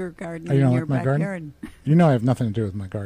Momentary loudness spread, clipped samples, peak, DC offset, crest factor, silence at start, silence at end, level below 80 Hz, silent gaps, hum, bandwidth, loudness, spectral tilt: 15 LU; under 0.1%; -8 dBFS; under 0.1%; 14 dB; 0 s; 0 s; -52 dBFS; none; none; 11 kHz; -21 LUFS; -9 dB/octave